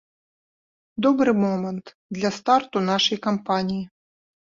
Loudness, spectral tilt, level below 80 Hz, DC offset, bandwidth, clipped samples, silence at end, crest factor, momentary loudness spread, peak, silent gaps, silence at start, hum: -22 LUFS; -5 dB/octave; -64 dBFS; under 0.1%; 7.6 kHz; under 0.1%; 0.7 s; 18 dB; 15 LU; -6 dBFS; 1.94-2.09 s; 0.95 s; none